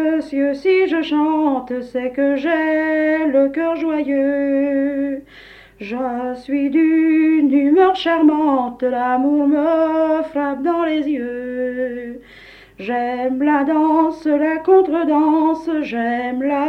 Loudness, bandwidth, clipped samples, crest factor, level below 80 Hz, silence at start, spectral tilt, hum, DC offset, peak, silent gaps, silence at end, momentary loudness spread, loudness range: -17 LUFS; 6 kHz; under 0.1%; 14 dB; -54 dBFS; 0 s; -6 dB/octave; 50 Hz at -55 dBFS; under 0.1%; -4 dBFS; none; 0 s; 9 LU; 5 LU